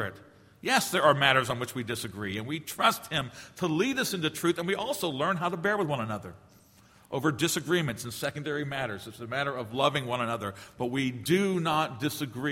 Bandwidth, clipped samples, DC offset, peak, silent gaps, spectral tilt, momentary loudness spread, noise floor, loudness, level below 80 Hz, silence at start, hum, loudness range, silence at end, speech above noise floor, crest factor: 16.5 kHz; under 0.1%; under 0.1%; -6 dBFS; none; -4 dB/octave; 10 LU; -58 dBFS; -29 LUFS; -64 dBFS; 0 s; none; 4 LU; 0 s; 29 dB; 24 dB